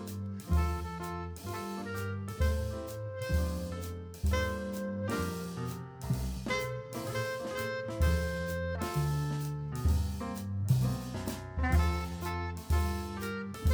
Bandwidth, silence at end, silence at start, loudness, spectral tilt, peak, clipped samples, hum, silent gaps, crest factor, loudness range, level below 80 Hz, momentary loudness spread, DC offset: over 20 kHz; 0 s; 0 s; -35 LUFS; -6 dB/octave; -16 dBFS; under 0.1%; none; none; 18 dB; 3 LU; -38 dBFS; 9 LU; under 0.1%